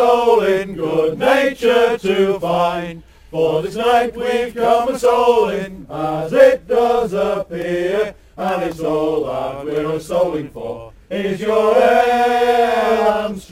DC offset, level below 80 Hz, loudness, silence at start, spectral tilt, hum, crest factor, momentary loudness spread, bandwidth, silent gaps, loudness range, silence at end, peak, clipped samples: under 0.1%; -46 dBFS; -16 LUFS; 0 s; -5.5 dB/octave; none; 16 dB; 12 LU; 16 kHz; none; 5 LU; 0.05 s; 0 dBFS; under 0.1%